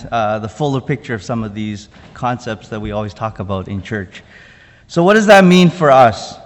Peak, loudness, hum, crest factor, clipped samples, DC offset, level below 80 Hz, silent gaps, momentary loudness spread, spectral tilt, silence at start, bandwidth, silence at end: 0 dBFS; -14 LUFS; none; 14 dB; 0.6%; under 0.1%; -44 dBFS; none; 17 LU; -6 dB/octave; 0 s; 11.5 kHz; 0.05 s